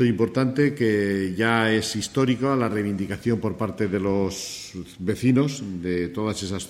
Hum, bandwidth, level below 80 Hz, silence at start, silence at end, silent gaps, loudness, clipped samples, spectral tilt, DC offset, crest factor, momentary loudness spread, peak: none; 15.5 kHz; -54 dBFS; 0 s; 0 s; none; -24 LUFS; under 0.1%; -5.5 dB/octave; under 0.1%; 18 dB; 8 LU; -6 dBFS